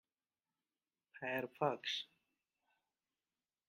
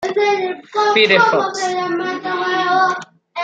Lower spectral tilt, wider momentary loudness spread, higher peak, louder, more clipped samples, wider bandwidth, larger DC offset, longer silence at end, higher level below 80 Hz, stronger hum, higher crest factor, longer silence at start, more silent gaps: about the same, -4 dB/octave vs -3.5 dB/octave; about the same, 9 LU vs 10 LU; second, -22 dBFS vs -2 dBFS; second, -41 LUFS vs -16 LUFS; neither; first, 14.5 kHz vs 9.2 kHz; neither; first, 1.65 s vs 0 s; second, under -90 dBFS vs -68 dBFS; neither; first, 26 dB vs 16 dB; first, 1.15 s vs 0 s; neither